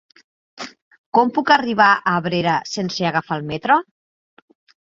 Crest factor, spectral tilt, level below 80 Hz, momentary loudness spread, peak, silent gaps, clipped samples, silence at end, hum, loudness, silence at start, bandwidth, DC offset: 20 dB; -5 dB/octave; -60 dBFS; 18 LU; -2 dBFS; 0.82-0.91 s, 0.98-1.12 s; under 0.1%; 1.1 s; none; -18 LUFS; 0.6 s; 7.8 kHz; under 0.1%